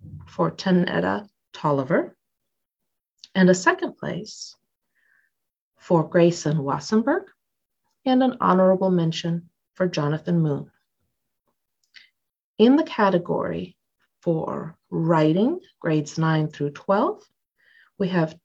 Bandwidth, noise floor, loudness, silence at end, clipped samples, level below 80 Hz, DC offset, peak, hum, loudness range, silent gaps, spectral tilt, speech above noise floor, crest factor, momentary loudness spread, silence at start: 8 kHz; -82 dBFS; -23 LUFS; 0.1 s; under 0.1%; -64 dBFS; under 0.1%; -4 dBFS; none; 3 LU; 5.61-5.72 s, 12.40-12.54 s; -6.5 dB/octave; 60 dB; 20 dB; 13 LU; 0.05 s